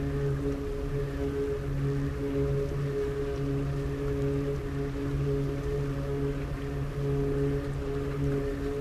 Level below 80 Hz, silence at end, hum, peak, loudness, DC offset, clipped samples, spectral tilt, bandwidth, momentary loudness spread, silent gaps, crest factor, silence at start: -38 dBFS; 0 s; none; -18 dBFS; -31 LUFS; under 0.1%; under 0.1%; -8 dB/octave; 13.5 kHz; 4 LU; none; 12 dB; 0 s